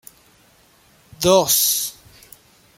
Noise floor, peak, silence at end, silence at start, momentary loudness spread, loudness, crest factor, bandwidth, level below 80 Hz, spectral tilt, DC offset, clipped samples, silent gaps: -54 dBFS; -2 dBFS; 0.85 s; 1.2 s; 9 LU; -17 LUFS; 20 dB; 16.5 kHz; -56 dBFS; -2.5 dB/octave; under 0.1%; under 0.1%; none